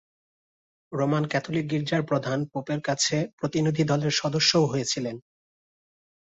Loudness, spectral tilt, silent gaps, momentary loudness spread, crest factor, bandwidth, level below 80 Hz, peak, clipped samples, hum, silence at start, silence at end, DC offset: -25 LUFS; -4.5 dB/octave; 3.33-3.38 s; 9 LU; 20 dB; 8.2 kHz; -64 dBFS; -6 dBFS; under 0.1%; none; 0.9 s; 1.1 s; under 0.1%